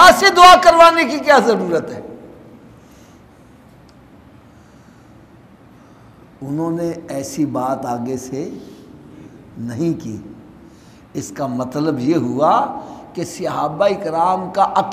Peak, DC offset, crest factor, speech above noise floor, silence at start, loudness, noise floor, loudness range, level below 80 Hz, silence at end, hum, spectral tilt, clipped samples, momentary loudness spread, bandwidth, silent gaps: 0 dBFS; under 0.1%; 16 dB; 30 dB; 0 s; -15 LUFS; -45 dBFS; 14 LU; -48 dBFS; 0 s; none; -4 dB/octave; under 0.1%; 23 LU; 15.5 kHz; none